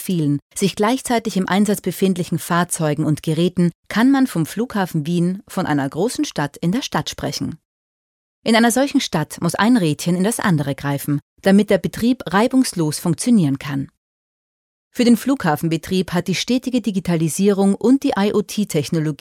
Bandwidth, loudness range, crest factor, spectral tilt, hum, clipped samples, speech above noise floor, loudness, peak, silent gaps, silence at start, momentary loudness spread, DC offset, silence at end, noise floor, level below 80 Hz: 17 kHz; 3 LU; 16 dB; -5.5 dB/octave; none; under 0.1%; over 72 dB; -19 LUFS; -4 dBFS; 0.42-0.50 s, 3.75-3.83 s, 7.65-8.42 s, 11.22-11.36 s, 13.97-14.91 s; 0 s; 7 LU; under 0.1%; 0.05 s; under -90 dBFS; -52 dBFS